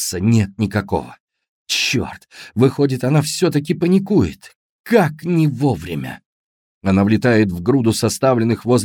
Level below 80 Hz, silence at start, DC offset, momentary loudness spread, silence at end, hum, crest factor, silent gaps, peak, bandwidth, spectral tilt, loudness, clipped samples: -46 dBFS; 0 s; under 0.1%; 10 LU; 0 s; none; 16 dB; 1.20-1.28 s, 1.49-1.66 s, 4.55-4.84 s, 6.26-6.81 s; 0 dBFS; 18.5 kHz; -5.5 dB/octave; -17 LUFS; under 0.1%